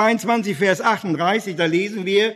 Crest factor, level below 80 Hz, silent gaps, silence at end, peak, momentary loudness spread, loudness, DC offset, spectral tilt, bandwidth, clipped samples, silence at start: 16 dB; -70 dBFS; none; 0 s; -2 dBFS; 3 LU; -19 LUFS; under 0.1%; -5 dB/octave; 13.5 kHz; under 0.1%; 0 s